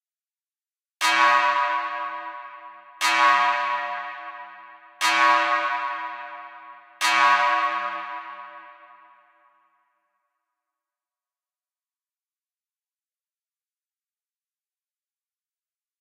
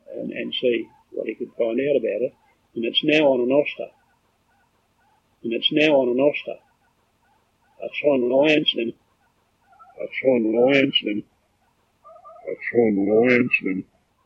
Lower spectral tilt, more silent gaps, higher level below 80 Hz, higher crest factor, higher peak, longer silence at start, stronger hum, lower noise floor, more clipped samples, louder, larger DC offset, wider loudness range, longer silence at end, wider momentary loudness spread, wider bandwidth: second, 1 dB/octave vs -6 dB/octave; neither; second, under -90 dBFS vs -70 dBFS; about the same, 22 dB vs 20 dB; about the same, -6 dBFS vs -4 dBFS; first, 1 s vs 0.1 s; neither; first, under -90 dBFS vs -65 dBFS; neither; about the same, -21 LUFS vs -21 LUFS; neither; first, 6 LU vs 3 LU; first, 7.25 s vs 0.45 s; first, 22 LU vs 17 LU; first, 16 kHz vs 7.6 kHz